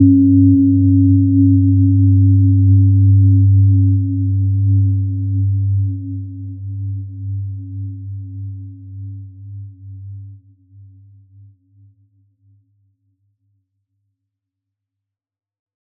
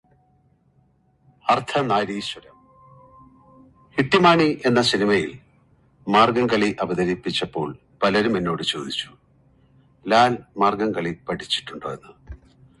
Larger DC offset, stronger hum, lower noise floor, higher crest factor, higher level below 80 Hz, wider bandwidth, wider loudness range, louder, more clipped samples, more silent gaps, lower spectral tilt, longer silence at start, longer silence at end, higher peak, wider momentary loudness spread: neither; neither; first, -83 dBFS vs -61 dBFS; second, 14 dB vs 22 dB; about the same, -50 dBFS vs -54 dBFS; second, 0.5 kHz vs 11.5 kHz; first, 22 LU vs 7 LU; first, -13 LUFS vs -21 LUFS; neither; neither; first, -21 dB/octave vs -5 dB/octave; second, 0 s vs 1.45 s; first, 5.65 s vs 0.45 s; about the same, -2 dBFS vs -2 dBFS; first, 23 LU vs 15 LU